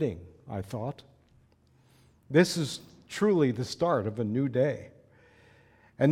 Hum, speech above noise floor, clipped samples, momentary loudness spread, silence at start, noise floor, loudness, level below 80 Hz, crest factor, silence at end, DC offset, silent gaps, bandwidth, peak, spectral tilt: none; 35 dB; under 0.1%; 16 LU; 0 s; -63 dBFS; -29 LUFS; -64 dBFS; 22 dB; 0 s; under 0.1%; none; 16 kHz; -8 dBFS; -6 dB/octave